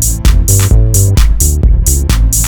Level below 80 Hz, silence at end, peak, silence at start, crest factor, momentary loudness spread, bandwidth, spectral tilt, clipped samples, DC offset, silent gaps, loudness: -10 dBFS; 0 s; 0 dBFS; 0 s; 8 dB; 2 LU; over 20 kHz; -4 dB/octave; 1%; under 0.1%; none; -10 LUFS